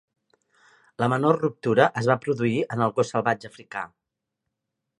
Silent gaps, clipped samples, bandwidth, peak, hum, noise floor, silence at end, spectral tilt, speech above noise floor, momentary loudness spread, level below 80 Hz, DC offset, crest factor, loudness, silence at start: none; under 0.1%; 11 kHz; -4 dBFS; none; -84 dBFS; 1.15 s; -6.5 dB/octave; 61 dB; 14 LU; -66 dBFS; under 0.1%; 22 dB; -24 LUFS; 1 s